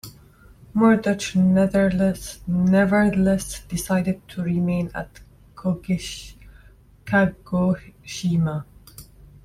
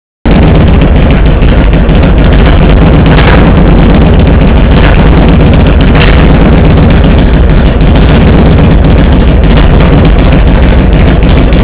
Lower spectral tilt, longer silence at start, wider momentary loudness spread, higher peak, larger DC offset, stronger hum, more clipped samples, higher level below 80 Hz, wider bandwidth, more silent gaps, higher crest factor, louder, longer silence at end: second, -6.5 dB/octave vs -11.5 dB/octave; second, 0.05 s vs 0.25 s; first, 15 LU vs 2 LU; second, -6 dBFS vs 0 dBFS; neither; neither; second, under 0.1% vs 20%; second, -46 dBFS vs -4 dBFS; first, 14.5 kHz vs 4 kHz; neither; first, 16 dB vs 2 dB; second, -22 LUFS vs -4 LUFS; first, 0.4 s vs 0 s